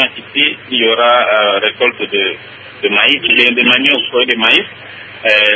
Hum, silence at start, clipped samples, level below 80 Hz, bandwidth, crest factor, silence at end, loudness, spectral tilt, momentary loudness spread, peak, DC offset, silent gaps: none; 0 s; 0.1%; -58 dBFS; 8 kHz; 12 dB; 0 s; -10 LUFS; -4 dB/octave; 11 LU; 0 dBFS; under 0.1%; none